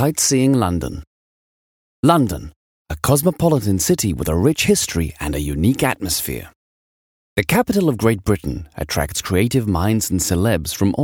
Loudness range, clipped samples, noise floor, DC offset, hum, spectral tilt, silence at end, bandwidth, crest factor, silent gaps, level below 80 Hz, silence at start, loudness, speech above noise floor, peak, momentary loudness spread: 3 LU; under 0.1%; under -90 dBFS; under 0.1%; none; -5 dB/octave; 0 s; over 20 kHz; 18 dB; 1.07-2.03 s, 2.56-2.85 s, 6.56-7.36 s; -36 dBFS; 0 s; -18 LUFS; over 72 dB; 0 dBFS; 9 LU